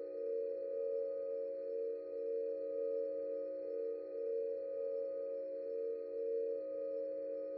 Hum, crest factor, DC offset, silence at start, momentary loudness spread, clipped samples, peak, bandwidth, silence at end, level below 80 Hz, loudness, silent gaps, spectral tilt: none; 10 dB; under 0.1%; 0 s; 3 LU; under 0.1%; -30 dBFS; 4.6 kHz; 0 s; -90 dBFS; -41 LUFS; none; -6 dB/octave